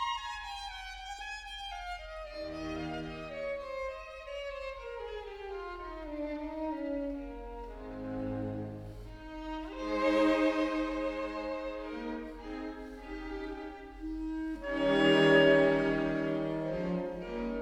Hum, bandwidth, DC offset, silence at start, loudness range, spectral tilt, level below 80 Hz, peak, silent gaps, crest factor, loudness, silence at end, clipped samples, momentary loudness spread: none; 11 kHz; under 0.1%; 0 s; 12 LU; -6 dB/octave; -52 dBFS; -10 dBFS; none; 22 dB; -34 LUFS; 0 s; under 0.1%; 16 LU